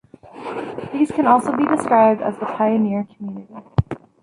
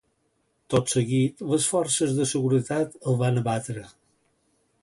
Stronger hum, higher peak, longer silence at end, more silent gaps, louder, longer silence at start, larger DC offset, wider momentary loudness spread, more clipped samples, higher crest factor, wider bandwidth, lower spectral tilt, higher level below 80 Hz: neither; first, -4 dBFS vs -8 dBFS; second, 0.25 s vs 0.95 s; neither; first, -19 LUFS vs -24 LUFS; second, 0.35 s vs 0.7 s; neither; first, 18 LU vs 5 LU; neither; about the same, 16 dB vs 16 dB; about the same, 11.5 kHz vs 11.5 kHz; first, -8 dB/octave vs -5 dB/octave; first, -44 dBFS vs -60 dBFS